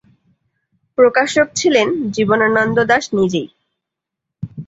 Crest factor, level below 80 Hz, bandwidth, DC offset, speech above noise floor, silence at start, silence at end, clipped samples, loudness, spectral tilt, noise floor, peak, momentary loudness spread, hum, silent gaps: 16 dB; -54 dBFS; 8 kHz; under 0.1%; 67 dB; 1 s; 0.05 s; under 0.1%; -15 LUFS; -4.5 dB/octave; -81 dBFS; -2 dBFS; 13 LU; none; none